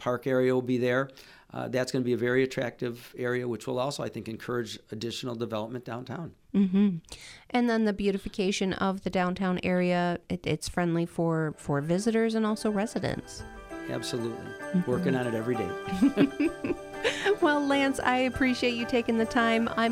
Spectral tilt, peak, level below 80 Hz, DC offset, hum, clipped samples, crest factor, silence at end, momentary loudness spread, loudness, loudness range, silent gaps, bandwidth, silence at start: -6 dB/octave; -10 dBFS; -56 dBFS; under 0.1%; none; under 0.1%; 18 dB; 0 s; 11 LU; -28 LUFS; 5 LU; none; 15.5 kHz; 0 s